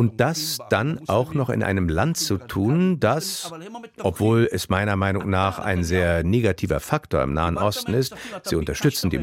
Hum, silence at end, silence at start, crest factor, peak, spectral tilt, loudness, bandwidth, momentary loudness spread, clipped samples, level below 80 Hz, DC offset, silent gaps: none; 0 s; 0 s; 18 dB; -4 dBFS; -5.5 dB/octave; -22 LUFS; 16.5 kHz; 7 LU; under 0.1%; -40 dBFS; under 0.1%; none